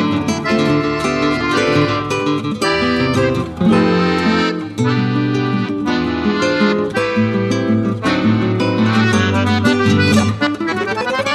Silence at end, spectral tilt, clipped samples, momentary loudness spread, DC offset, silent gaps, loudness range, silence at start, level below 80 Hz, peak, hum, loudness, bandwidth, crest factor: 0 s; -6 dB/octave; under 0.1%; 5 LU; under 0.1%; none; 2 LU; 0 s; -42 dBFS; -2 dBFS; none; -15 LUFS; 12.5 kHz; 14 dB